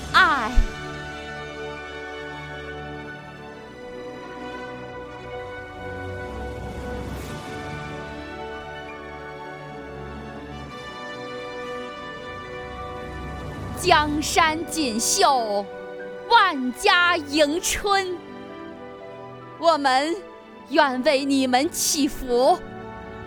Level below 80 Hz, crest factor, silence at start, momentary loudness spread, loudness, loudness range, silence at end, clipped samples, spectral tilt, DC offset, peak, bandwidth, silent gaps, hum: -38 dBFS; 22 dB; 0 s; 18 LU; -23 LUFS; 15 LU; 0 s; under 0.1%; -3 dB/octave; under 0.1%; -2 dBFS; over 20 kHz; none; none